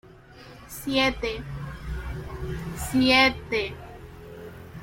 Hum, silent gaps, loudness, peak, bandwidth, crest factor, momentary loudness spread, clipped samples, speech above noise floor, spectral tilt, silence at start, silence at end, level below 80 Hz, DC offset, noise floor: none; none; -25 LUFS; -6 dBFS; 16.5 kHz; 22 dB; 23 LU; under 0.1%; 24 dB; -4.5 dB/octave; 0.05 s; 0 s; -42 dBFS; under 0.1%; -47 dBFS